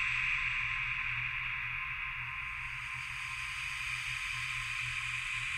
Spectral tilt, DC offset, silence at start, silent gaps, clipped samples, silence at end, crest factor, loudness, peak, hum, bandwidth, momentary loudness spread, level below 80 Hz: -0.5 dB/octave; under 0.1%; 0 s; none; under 0.1%; 0 s; 16 dB; -35 LUFS; -22 dBFS; none; 16 kHz; 7 LU; -54 dBFS